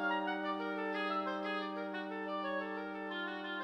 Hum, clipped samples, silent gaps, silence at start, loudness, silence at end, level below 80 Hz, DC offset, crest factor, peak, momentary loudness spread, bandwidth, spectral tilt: none; under 0.1%; none; 0 s; -39 LUFS; 0 s; -82 dBFS; under 0.1%; 14 dB; -24 dBFS; 5 LU; 8.4 kHz; -6 dB/octave